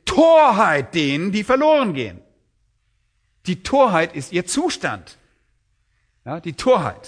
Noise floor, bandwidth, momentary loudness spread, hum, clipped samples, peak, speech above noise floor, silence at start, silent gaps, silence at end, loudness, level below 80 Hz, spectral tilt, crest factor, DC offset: -66 dBFS; 10.5 kHz; 17 LU; none; under 0.1%; -2 dBFS; 48 dB; 0.05 s; none; 0 s; -18 LUFS; -50 dBFS; -5 dB/octave; 18 dB; under 0.1%